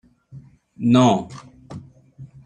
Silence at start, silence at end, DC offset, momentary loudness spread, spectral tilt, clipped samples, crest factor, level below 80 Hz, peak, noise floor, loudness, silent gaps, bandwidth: 0.35 s; 0.2 s; under 0.1%; 24 LU; -6.5 dB/octave; under 0.1%; 20 dB; -58 dBFS; -4 dBFS; -45 dBFS; -18 LUFS; none; 9.2 kHz